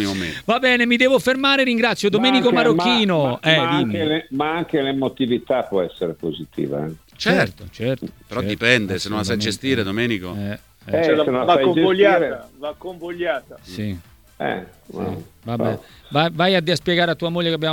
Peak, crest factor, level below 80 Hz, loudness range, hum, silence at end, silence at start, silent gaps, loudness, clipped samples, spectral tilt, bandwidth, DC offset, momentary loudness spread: 0 dBFS; 20 dB; -52 dBFS; 7 LU; none; 0 s; 0 s; none; -19 LUFS; under 0.1%; -5 dB/octave; 18.5 kHz; under 0.1%; 14 LU